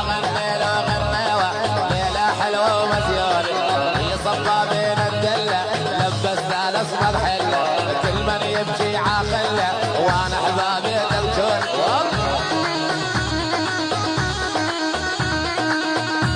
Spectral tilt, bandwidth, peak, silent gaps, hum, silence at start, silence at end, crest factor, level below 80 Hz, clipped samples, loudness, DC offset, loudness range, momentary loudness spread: -4.5 dB/octave; 10 kHz; -4 dBFS; none; none; 0 s; 0 s; 16 dB; -38 dBFS; under 0.1%; -20 LUFS; under 0.1%; 2 LU; 3 LU